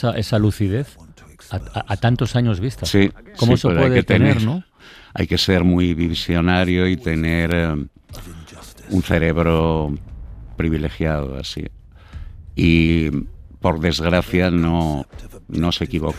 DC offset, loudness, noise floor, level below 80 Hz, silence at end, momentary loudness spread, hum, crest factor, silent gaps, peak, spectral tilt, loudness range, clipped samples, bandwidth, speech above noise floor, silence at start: under 0.1%; -19 LUFS; -39 dBFS; -34 dBFS; 0 s; 20 LU; none; 16 dB; none; -2 dBFS; -6.5 dB/octave; 4 LU; under 0.1%; 15 kHz; 21 dB; 0 s